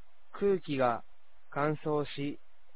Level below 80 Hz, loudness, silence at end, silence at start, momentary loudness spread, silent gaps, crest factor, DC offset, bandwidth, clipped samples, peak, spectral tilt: -64 dBFS; -33 LUFS; 0.4 s; 0.35 s; 11 LU; none; 18 dB; 0.8%; 4 kHz; under 0.1%; -16 dBFS; -5.5 dB/octave